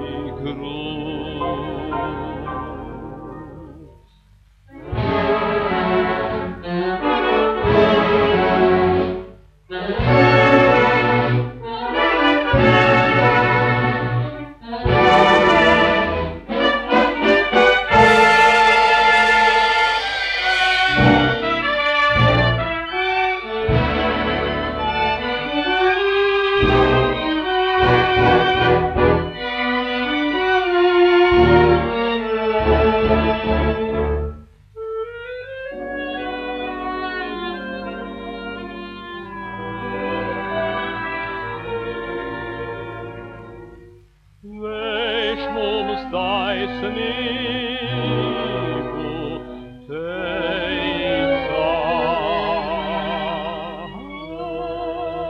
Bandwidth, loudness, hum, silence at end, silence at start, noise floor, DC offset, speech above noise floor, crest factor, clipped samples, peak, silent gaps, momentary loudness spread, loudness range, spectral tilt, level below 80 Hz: 10.5 kHz; -17 LUFS; 50 Hz at -45 dBFS; 0 s; 0 s; -51 dBFS; under 0.1%; 26 dB; 18 dB; under 0.1%; 0 dBFS; none; 17 LU; 13 LU; -6 dB/octave; -36 dBFS